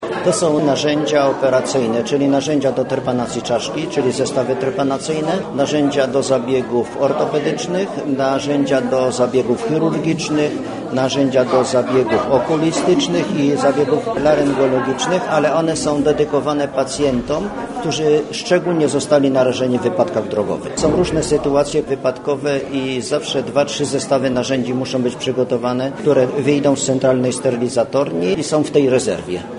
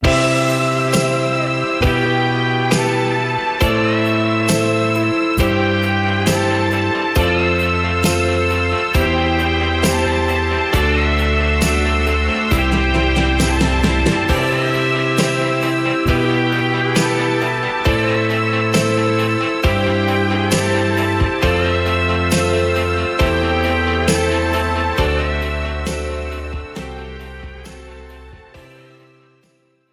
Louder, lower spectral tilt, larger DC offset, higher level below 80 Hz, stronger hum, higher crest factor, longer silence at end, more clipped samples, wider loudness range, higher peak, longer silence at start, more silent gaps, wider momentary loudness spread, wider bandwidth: about the same, -17 LUFS vs -17 LUFS; about the same, -5 dB/octave vs -5 dB/octave; neither; second, -46 dBFS vs -26 dBFS; neither; about the same, 16 dB vs 14 dB; second, 0 s vs 1.35 s; neither; about the same, 2 LU vs 4 LU; about the same, 0 dBFS vs -2 dBFS; about the same, 0 s vs 0 s; neither; about the same, 5 LU vs 3 LU; second, 11 kHz vs 16 kHz